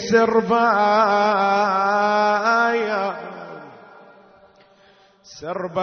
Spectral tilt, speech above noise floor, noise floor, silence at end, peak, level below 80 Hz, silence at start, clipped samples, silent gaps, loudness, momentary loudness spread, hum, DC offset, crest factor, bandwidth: -5 dB/octave; 35 dB; -54 dBFS; 0 s; -4 dBFS; -66 dBFS; 0 s; under 0.1%; none; -18 LUFS; 18 LU; none; under 0.1%; 16 dB; 6.6 kHz